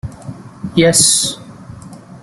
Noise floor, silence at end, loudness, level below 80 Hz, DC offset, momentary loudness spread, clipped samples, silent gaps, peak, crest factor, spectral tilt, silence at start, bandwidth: -35 dBFS; 0.05 s; -11 LUFS; -46 dBFS; under 0.1%; 24 LU; under 0.1%; none; 0 dBFS; 16 dB; -3 dB/octave; 0.05 s; over 20 kHz